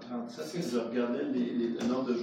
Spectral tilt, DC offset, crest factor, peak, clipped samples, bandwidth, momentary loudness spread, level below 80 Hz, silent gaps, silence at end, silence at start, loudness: -6 dB/octave; under 0.1%; 14 dB; -18 dBFS; under 0.1%; 14 kHz; 7 LU; -74 dBFS; none; 0 s; 0 s; -33 LUFS